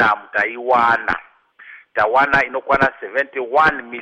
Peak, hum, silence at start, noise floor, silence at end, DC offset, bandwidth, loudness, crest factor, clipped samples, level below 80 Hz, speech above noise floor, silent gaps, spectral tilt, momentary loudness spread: -4 dBFS; none; 0 s; -43 dBFS; 0 s; under 0.1%; 10.5 kHz; -17 LUFS; 14 dB; under 0.1%; -48 dBFS; 26 dB; none; -5.5 dB/octave; 8 LU